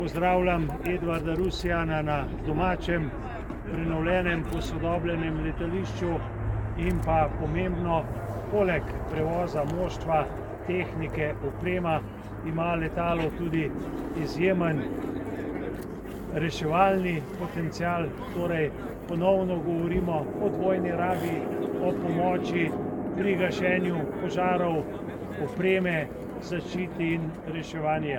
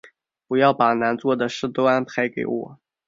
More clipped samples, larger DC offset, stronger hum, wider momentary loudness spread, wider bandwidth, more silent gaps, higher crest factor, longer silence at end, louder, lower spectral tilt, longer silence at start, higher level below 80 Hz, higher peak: neither; neither; neither; about the same, 9 LU vs 10 LU; first, 18 kHz vs 7.6 kHz; neither; about the same, 20 dB vs 18 dB; second, 0 s vs 0.35 s; second, -28 LUFS vs -21 LUFS; first, -7.5 dB/octave vs -6 dB/octave; about the same, 0 s vs 0.05 s; first, -40 dBFS vs -64 dBFS; second, -8 dBFS vs -4 dBFS